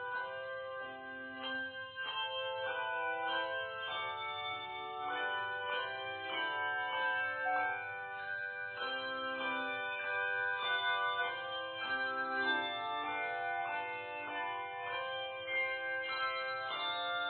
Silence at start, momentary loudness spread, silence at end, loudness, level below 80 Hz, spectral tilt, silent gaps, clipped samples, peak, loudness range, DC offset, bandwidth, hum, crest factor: 0 s; 7 LU; 0 s; -37 LUFS; -82 dBFS; 1.5 dB/octave; none; under 0.1%; -22 dBFS; 3 LU; under 0.1%; 4.6 kHz; none; 16 dB